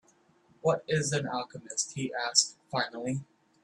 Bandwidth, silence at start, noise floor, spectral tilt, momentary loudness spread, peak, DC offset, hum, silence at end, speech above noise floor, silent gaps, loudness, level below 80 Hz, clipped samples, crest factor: 12.5 kHz; 0.65 s; -65 dBFS; -3 dB/octave; 10 LU; -8 dBFS; under 0.1%; none; 0.4 s; 34 dB; none; -30 LUFS; -70 dBFS; under 0.1%; 24 dB